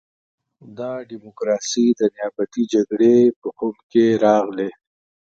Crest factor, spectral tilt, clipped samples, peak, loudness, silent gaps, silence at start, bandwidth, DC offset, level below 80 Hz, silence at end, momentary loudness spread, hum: 16 dB; -5.5 dB/octave; under 0.1%; -2 dBFS; -19 LUFS; 3.36-3.42 s, 3.83-3.90 s; 0.65 s; 7.8 kHz; under 0.1%; -66 dBFS; 0.55 s; 14 LU; none